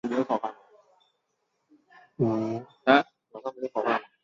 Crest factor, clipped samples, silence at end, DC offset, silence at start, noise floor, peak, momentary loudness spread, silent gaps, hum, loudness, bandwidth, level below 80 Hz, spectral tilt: 24 dB; under 0.1%; 0.2 s; under 0.1%; 0.05 s; -77 dBFS; -6 dBFS; 16 LU; none; none; -27 LUFS; 7.4 kHz; -70 dBFS; -7 dB/octave